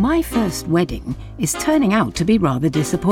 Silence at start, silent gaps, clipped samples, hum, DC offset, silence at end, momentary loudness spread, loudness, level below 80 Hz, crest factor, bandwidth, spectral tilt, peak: 0 s; none; under 0.1%; none; under 0.1%; 0 s; 8 LU; -18 LUFS; -36 dBFS; 14 dB; 17.5 kHz; -5.5 dB/octave; -4 dBFS